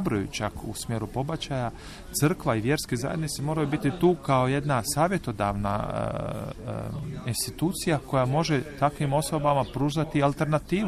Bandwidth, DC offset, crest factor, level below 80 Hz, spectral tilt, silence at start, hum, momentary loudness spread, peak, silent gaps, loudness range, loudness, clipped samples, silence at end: 14.5 kHz; under 0.1%; 18 dB; -46 dBFS; -5.5 dB/octave; 0 s; none; 9 LU; -10 dBFS; none; 3 LU; -27 LUFS; under 0.1%; 0 s